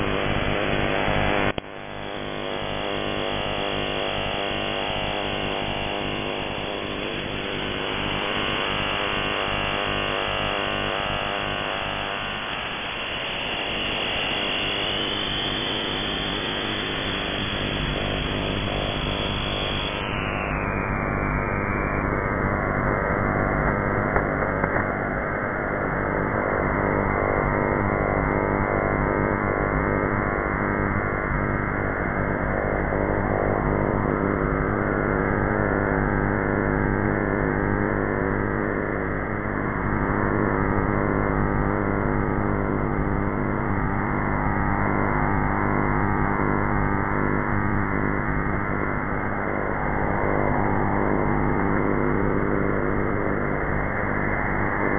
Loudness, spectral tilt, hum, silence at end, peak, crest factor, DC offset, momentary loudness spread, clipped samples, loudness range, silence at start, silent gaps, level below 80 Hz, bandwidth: -24 LUFS; -9.5 dB/octave; none; 0 s; -6 dBFS; 18 dB; under 0.1%; 3 LU; under 0.1%; 3 LU; 0 s; none; -34 dBFS; 3.7 kHz